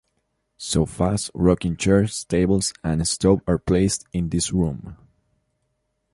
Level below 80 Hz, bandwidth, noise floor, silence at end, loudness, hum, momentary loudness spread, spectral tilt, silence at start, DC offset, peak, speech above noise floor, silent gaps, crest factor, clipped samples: -38 dBFS; 11.5 kHz; -73 dBFS; 1.2 s; -21 LUFS; none; 6 LU; -5.5 dB/octave; 0.6 s; under 0.1%; -4 dBFS; 52 dB; none; 18 dB; under 0.1%